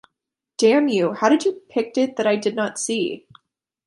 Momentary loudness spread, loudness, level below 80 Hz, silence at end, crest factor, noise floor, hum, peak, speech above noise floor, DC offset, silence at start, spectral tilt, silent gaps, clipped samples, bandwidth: 9 LU; -20 LUFS; -72 dBFS; 0.65 s; 18 dB; -82 dBFS; none; -4 dBFS; 63 dB; under 0.1%; 0.6 s; -4 dB/octave; none; under 0.1%; 11.5 kHz